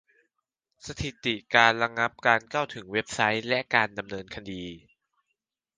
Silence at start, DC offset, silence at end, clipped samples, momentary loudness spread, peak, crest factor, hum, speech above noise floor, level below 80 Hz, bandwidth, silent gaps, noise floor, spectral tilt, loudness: 0.85 s; under 0.1%; 1 s; under 0.1%; 18 LU; -2 dBFS; 26 dB; none; 55 dB; -56 dBFS; 9.8 kHz; none; -83 dBFS; -3.5 dB/octave; -25 LUFS